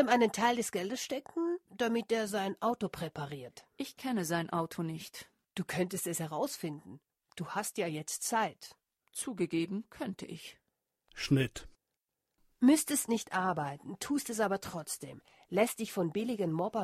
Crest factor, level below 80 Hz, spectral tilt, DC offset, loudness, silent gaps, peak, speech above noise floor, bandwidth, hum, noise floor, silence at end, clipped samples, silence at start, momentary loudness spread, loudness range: 22 dB; -68 dBFS; -4.5 dB/octave; under 0.1%; -34 LUFS; none; -14 dBFS; 54 dB; 14.5 kHz; none; -88 dBFS; 0 s; under 0.1%; 0 s; 15 LU; 5 LU